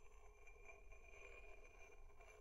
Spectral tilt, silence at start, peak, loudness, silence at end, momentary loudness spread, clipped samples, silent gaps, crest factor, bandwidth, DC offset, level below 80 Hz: -3.5 dB/octave; 0 s; -48 dBFS; -64 LUFS; 0 s; 6 LU; under 0.1%; none; 14 dB; 11.5 kHz; under 0.1%; -64 dBFS